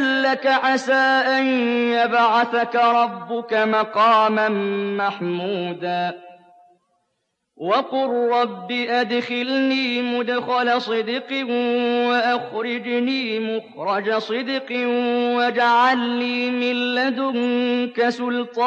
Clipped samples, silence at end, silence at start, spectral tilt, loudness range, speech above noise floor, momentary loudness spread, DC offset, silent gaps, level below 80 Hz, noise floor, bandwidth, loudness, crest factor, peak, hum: under 0.1%; 0 s; 0 s; -5 dB/octave; 6 LU; 54 dB; 8 LU; under 0.1%; none; -80 dBFS; -74 dBFS; 8.4 kHz; -20 LUFS; 14 dB; -6 dBFS; none